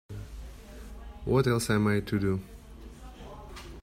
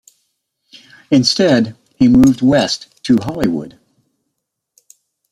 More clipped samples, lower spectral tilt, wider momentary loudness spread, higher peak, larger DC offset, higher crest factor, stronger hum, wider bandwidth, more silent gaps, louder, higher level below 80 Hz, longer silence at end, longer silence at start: neither; about the same, -6 dB/octave vs -5.5 dB/octave; first, 22 LU vs 12 LU; second, -12 dBFS vs 0 dBFS; neither; about the same, 18 dB vs 16 dB; neither; first, 16 kHz vs 12 kHz; neither; second, -28 LUFS vs -14 LUFS; about the same, -46 dBFS vs -44 dBFS; second, 0 s vs 1.65 s; second, 0.1 s vs 1.1 s